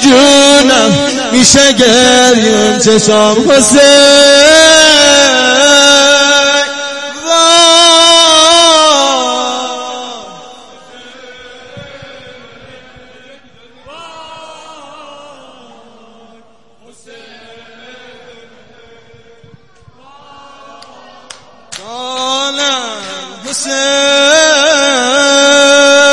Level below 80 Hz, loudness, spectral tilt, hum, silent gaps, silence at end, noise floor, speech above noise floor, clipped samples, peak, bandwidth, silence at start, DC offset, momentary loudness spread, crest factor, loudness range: -44 dBFS; -5 LUFS; -1.5 dB/octave; none; none; 0 s; -45 dBFS; 40 dB; 0.9%; 0 dBFS; 12 kHz; 0 s; under 0.1%; 16 LU; 10 dB; 15 LU